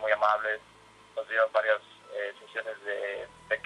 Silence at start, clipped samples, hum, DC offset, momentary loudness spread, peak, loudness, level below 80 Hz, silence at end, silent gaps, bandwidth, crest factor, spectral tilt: 0 s; under 0.1%; none; under 0.1%; 14 LU; -10 dBFS; -30 LUFS; -72 dBFS; 0.05 s; none; 11 kHz; 20 dB; -2.5 dB/octave